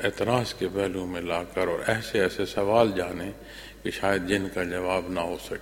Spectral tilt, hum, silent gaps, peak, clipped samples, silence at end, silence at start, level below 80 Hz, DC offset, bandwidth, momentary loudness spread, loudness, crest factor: -5 dB/octave; none; none; -4 dBFS; under 0.1%; 0 s; 0 s; -50 dBFS; under 0.1%; 16.5 kHz; 10 LU; -27 LUFS; 22 dB